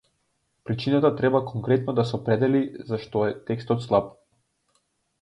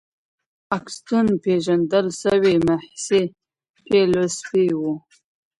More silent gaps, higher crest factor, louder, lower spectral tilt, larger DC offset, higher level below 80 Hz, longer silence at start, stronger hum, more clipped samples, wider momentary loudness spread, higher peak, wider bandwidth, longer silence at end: second, none vs 3.70-3.74 s; about the same, 18 dB vs 16 dB; second, -24 LUFS vs -20 LUFS; first, -8.5 dB/octave vs -5.5 dB/octave; neither; about the same, -58 dBFS vs -56 dBFS; about the same, 0.65 s vs 0.7 s; neither; neither; about the same, 10 LU vs 10 LU; about the same, -6 dBFS vs -6 dBFS; about the same, 10.5 kHz vs 11.5 kHz; first, 1.1 s vs 0.6 s